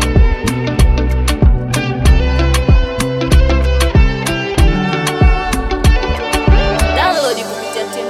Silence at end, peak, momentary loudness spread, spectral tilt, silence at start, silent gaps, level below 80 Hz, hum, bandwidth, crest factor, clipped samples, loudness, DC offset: 0 s; 0 dBFS; 5 LU; -5.5 dB/octave; 0 s; none; -14 dBFS; none; 14.5 kHz; 12 dB; under 0.1%; -14 LUFS; under 0.1%